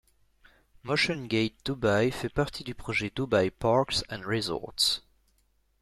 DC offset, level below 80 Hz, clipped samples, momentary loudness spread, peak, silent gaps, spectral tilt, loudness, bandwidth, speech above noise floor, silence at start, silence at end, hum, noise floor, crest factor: under 0.1%; -52 dBFS; under 0.1%; 7 LU; -10 dBFS; none; -4.5 dB/octave; -28 LUFS; 14.5 kHz; 41 dB; 0.85 s; 0.85 s; none; -69 dBFS; 18 dB